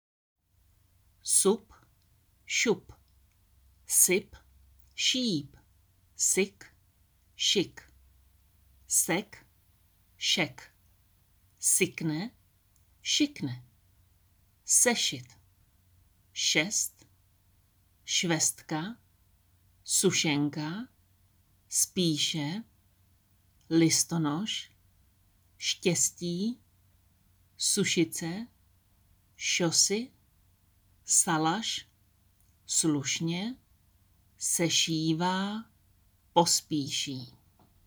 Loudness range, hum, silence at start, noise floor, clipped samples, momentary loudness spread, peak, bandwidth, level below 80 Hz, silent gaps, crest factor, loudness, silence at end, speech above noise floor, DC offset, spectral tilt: 4 LU; none; 1.25 s; -67 dBFS; under 0.1%; 17 LU; -8 dBFS; over 20 kHz; -68 dBFS; none; 24 dB; -28 LUFS; 0.55 s; 38 dB; under 0.1%; -2.5 dB/octave